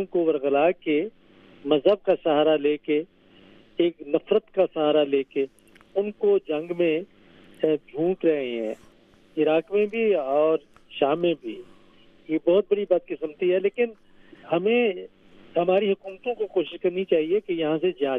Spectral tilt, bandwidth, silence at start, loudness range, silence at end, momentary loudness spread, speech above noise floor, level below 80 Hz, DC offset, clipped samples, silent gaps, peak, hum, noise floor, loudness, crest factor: -8 dB/octave; 4.1 kHz; 0 s; 2 LU; 0 s; 10 LU; 32 dB; -66 dBFS; under 0.1%; under 0.1%; none; -6 dBFS; none; -55 dBFS; -24 LUFS; 18 dB